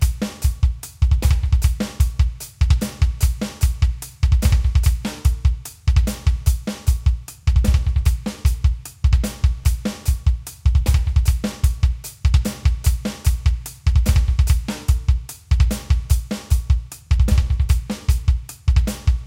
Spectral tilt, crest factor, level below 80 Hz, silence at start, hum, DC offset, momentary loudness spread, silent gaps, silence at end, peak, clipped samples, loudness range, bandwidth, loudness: -5.5 dB/octave; 14 dB; -18 dBFS; 0 s; none; under 0.1%; 5 LU; none; 0 s; -4 dBFS; under 0.1%; 1 LU; 16.5 kHz; -21 LUFS